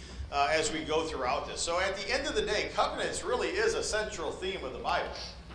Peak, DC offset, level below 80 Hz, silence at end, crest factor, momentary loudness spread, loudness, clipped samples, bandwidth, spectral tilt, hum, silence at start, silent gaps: -14 dBFS; under 0.1%; -48 dBFS; 0 s; 18 dB; 7 LU; -31 LUFS; under 0.1%; 10.5 kHz; -2.5 dB/octave; none; 0 s; none